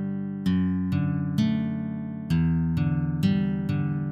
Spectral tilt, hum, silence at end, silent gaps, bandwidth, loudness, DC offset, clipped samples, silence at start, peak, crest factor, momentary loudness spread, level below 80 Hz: -8.5 dB/octave; none; 0 s; none; 8.6 kHz; -26 LUFS; under 0.1%; under 0.1%; 0 s; -12 dBFS; 14 dB; 6 LU; -44 dBFS